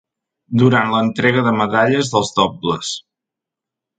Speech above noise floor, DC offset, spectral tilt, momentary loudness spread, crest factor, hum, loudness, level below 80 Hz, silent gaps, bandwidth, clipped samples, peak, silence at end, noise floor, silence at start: 69 dB; under 0.1%; -5 dB/octave; 9 LU; 16 dB; none; -16 LUFS; -54 dBFS; none; 9.4 kHz; under 0.1%; 0 dBFS; 1 s; -84 dBFS; 0.5 s